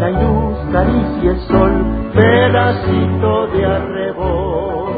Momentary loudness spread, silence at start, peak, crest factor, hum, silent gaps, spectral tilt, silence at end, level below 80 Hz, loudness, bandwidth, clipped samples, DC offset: 7 LU; 0 s; 0 dBFS; 14 dB; none; none; -11 dB/octave; 0 s; -24 dBFS; -14 LUFS; 4.9 kHz; under 0.1%; under 0.1%